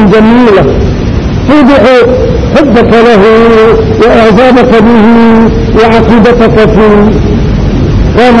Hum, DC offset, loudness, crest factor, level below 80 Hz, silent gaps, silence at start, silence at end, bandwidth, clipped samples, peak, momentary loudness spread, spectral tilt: none; under 0.1%; -4 LUFS; 2 dB; -16 dBFS; none; 0 s; 0 s; 9.6 kHz; 20%; 0 dBFS; 6 LU; -7.5 dB/octave